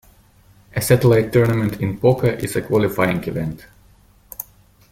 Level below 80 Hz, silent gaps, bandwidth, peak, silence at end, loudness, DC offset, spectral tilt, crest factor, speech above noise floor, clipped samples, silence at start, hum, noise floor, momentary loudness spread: -46 dBFS; none; 16.5 kHz; -2 dBFS; 0.5 s; -18 LUFS; under 0.1%; -6.5 dB/octave; 18 dB; 34 dB; under 0.1%; 0.75 s; 50 Hz at -40 dBFS; -52 dBFS; 19 LU